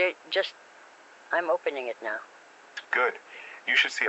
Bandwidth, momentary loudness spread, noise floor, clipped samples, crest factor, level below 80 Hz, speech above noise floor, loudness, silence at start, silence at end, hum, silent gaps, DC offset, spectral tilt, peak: 8.2 kHz; 19 LU; -52 dBFS; under 0.1%; 20 dB; under -90 dBFS; 24 dB; -28 LUFS; 0 s; 0 s; none; none; under 0.1%; -0.5 dB/octave; -8 dBFS